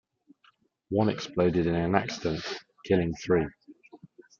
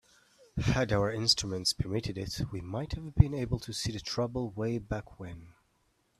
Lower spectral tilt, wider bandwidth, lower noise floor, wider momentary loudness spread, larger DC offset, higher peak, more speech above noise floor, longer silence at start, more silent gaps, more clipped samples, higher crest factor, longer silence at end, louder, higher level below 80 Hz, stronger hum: first, -6.5 dB/octave vs -5 dB/octave; second, 7.4 kHz vs 14 kHz; second, -65 dBFS vs -73 dBFS; second, 9 LU vs 12 LU; neither; about the same, -6 dBFS vs -6 dBFS; about the same, 39 dB vs 41 dB; first, 0.9 s vs 0.55 s; neither; neither; about the same, 24 dB vs 26 dB; second, 0.45 s vs 0.7 s; first, -28 LUFS vs -31 LUFS; second, -56 dBFS vs -44 dBFS; neither